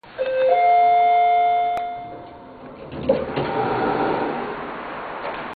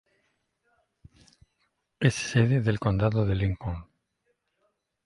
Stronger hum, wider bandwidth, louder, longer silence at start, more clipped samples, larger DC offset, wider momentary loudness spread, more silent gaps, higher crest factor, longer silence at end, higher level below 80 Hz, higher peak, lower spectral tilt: neither; second, 4.8 kHz vs 11.5 kHz; first, -20 LUFS vs -26 LUFS; second, 0.05 s vs 2 s; neither; neither; first, 21 LU vs 11 LU; neither; about the same, 16 dB vs 20 dB; second, 0.05 s vs 1.25 s; second, -52 dBFS vs -46 dBFS; about the same, -6 dBFS vs -8 dBFS; first, -8 dB/octave vs -6.5 dB/octave